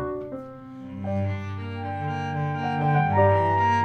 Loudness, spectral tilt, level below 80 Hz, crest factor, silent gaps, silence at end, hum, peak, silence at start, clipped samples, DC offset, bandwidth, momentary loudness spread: -25 LUFS; -8 dB/octave; -58 dBFS; 18 dB; none; 0 s; none; -8 dBFS; 0 s; under 0.1%; under 0.1%; 6.6 kHz; 17 LU